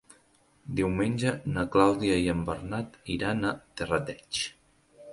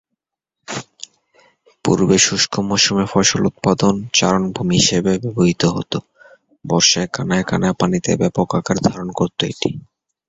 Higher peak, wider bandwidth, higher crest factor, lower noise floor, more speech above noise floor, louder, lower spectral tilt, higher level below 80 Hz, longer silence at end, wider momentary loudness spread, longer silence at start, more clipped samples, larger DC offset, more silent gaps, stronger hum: second, -6 dBFS vs 0 dBFS; first, 11.5 kHz vs 8.2 kHz; about the same, 22 dB vs 18 dB; second, -64 dBFS vs -80 dBFS; second, 36 dB vs 63 dB; second, -29 LUFS vs -17 LUFS; first, -5.5 dB/octave vs -4 dB/octave; about the same, -50 dBFS vs -46 dBFS; second, 0 s vs 0.5 s; about the same, 12 LU vs 14 LU; about the same, 0.65 s vs 0.7 s; neither; neither; neither; neither